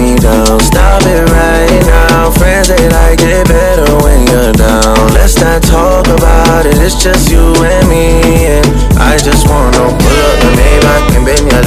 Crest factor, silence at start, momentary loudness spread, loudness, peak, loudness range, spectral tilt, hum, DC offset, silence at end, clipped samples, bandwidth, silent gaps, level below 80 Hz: 6 dB; 0 s; 1 LU; -7 LUFS; 0 dBFS; 0 LU; -5 dB/octave; none; under 0.1%; 0 s; 4%; 15.5 kHz; none; -10 dBFS